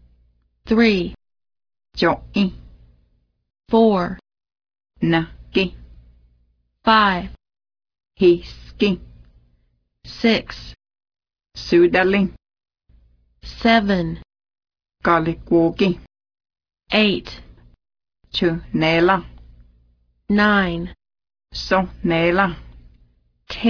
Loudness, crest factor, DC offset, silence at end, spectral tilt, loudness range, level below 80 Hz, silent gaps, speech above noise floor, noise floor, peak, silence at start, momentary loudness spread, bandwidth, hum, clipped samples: -19 LUFS; 18 dB; under 0.1%; 0 s; -6.5 dB/octave; 2 LU; -44 dBFS; none; 47 dB; -64 dBFS; -2 dBFS; 0.65 s; 19 LU; 5.4 kHz; 60 Hz at -55 dBFS; under 0.1%